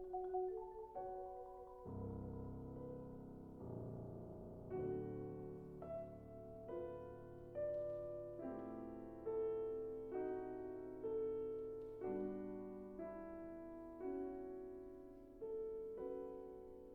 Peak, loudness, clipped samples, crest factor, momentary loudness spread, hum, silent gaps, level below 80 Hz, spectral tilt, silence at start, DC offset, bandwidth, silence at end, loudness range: -32 dBFS; -49 LUFS; under 0.1%; 16 dB; 10 LU; none; none; -66 dBFS; -10.5 dB/octave; 0 s; under 0.1%; 3.7 kHz; 0 s; 5 LU